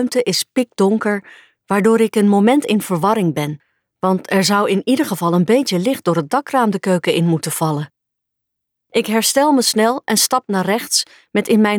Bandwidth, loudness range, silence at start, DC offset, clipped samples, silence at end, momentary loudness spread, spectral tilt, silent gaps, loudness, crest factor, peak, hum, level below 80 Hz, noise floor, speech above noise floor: 19.5 kHz; 2 LU; 0 s; under 0.1%; under 0.1%; 0 s; 8 LU; -4.5 dB/octave; none; -16 LUFS; 14 dB; -2 dBFS; none; -66 dBFS; -78 dBFS; 62 dB